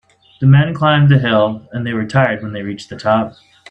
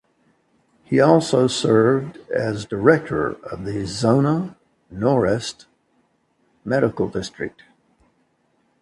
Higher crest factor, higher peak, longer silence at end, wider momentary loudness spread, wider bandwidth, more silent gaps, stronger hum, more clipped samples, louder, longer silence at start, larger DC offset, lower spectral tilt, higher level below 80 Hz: second, 14 dB vs 22 dB; about the same, 0 dBFS vs 0 dBFS; second, 0.4 s vs 1.35 s; about the same, 13 LU vs 15 LU; second, 8.2 kHz vs 11.5 kHz; neither; neither; neither; first, -14 LUFS vs -20 LUFS; second, 0.4 s vs 0.9 s; neither; first, -8 dB/octave vs -6 dB/octave; about the same, -50 dBFS vs -52 dBFS